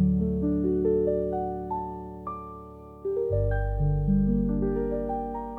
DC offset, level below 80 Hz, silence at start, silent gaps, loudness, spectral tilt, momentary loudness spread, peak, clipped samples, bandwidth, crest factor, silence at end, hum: under 0.1%; -36 dBFS; 0 s; none; -28 LUFS; -12 dB/octave; 13 LU; -14 dBFS; under 0.1%; 2.5 kHz; 12 dB; 0 s; none